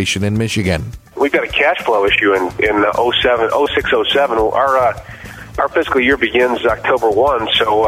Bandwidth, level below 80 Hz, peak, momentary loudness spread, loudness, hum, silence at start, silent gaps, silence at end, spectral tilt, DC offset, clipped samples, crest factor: 16 kHz; -38 dBFS; -2 dBFS; 6 LU; -14 LUFS; none; 0 s; none; 0 s; -4.5 dB/octave; under 0.1%; under 0.1%; 14 dB